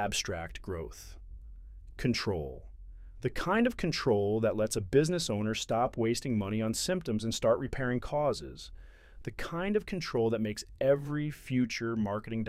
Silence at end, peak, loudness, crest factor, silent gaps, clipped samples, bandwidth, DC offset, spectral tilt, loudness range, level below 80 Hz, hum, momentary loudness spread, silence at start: 0 s; -14 dBFS; -32 LUFS; 18 dB; none; under 0.1%; 16 kHz; under 0.1%; -5 dB/octave; 5 LU; -50 dBFS; none; 17 LU; 0 s